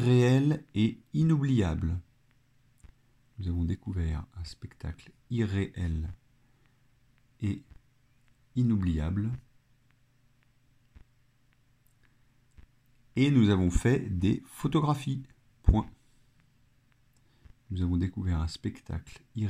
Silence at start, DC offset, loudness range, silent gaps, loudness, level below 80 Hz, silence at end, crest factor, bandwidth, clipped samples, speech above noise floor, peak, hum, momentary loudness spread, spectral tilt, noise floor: 0 s; under 0.1%; 9 LU; none; -30 LUFS; -42 dBFS; 0 s; 24 dB; 13.5 kHz; under 0.1%; 39 dB; -6 dBFS; none; 17 LU; -7.5 dB/octave; -67 dBFS